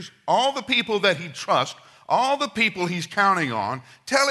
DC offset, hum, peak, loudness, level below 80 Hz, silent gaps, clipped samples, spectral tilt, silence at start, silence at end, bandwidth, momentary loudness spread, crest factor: under 0.1%; none; -4 dBFS; -22 LUFS; -68 dBFS; none; under 0.1%; -3.5 dB/octave; 0 s; 0 s; 12 kHz; 8 LU; 20 dB